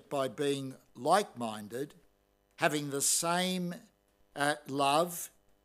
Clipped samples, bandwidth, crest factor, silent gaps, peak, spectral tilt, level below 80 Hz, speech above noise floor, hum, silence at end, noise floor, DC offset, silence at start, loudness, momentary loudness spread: under 0.1%; 16 kHz; 24 dB; none; -10 dBFS; -3 dB/octave; -78 dBFS; 39 dB; none; 0.35 s; -71 dBFS; under 0.1%; 0.1 s; -32 LUFS; 14 LU